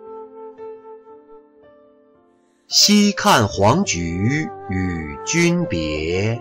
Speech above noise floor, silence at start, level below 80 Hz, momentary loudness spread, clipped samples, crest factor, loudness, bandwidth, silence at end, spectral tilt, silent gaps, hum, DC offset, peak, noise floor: 40 dB; 0 s; -44 dBFS; 24 LU; under 0.1%; 18 dB; -17 LUFS; 16 kHz; 0 s; -4 dB/octave; none; none; under 0.1%; -2 dBFS; -57 dBFS